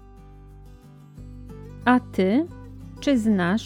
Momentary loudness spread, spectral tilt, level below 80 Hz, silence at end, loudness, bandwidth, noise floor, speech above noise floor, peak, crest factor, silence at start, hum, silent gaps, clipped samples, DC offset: 22 LU; -6.5 dB/octave; -46 dBFS; 0 s; -23 LUFS; 12 kHz; -46 dBFS; 26 dB; -6 dBFS; 20 dB; 0.55 s; 50 Hz at -55 dBFS; none; under 0.1%; under 0.1%